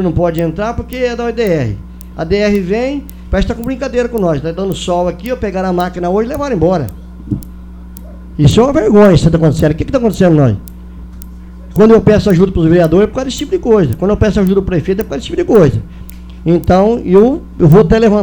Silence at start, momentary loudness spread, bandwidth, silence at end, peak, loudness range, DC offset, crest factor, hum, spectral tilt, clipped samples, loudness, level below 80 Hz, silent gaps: 0 s; 19 LU; over 20 kHz; 0 s; 0 dBFS; 5 LU; under 0.1%; 12 dB; none; -7.5 dB/octave; 0.3%; -12 LUFS; -26 dBFS; none